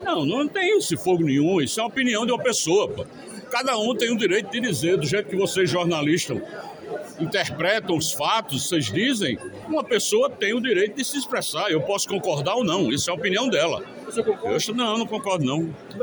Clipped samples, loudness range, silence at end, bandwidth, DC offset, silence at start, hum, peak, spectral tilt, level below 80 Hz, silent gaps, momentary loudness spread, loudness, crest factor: under 0.1%; 2 LU; 0 s; over 20 kHz; under 0.1%; 0 s; none; -8 dBFS; -4 dB/octave; -62 dBFS; none; 8 LU; -23 LUFS; 16 dB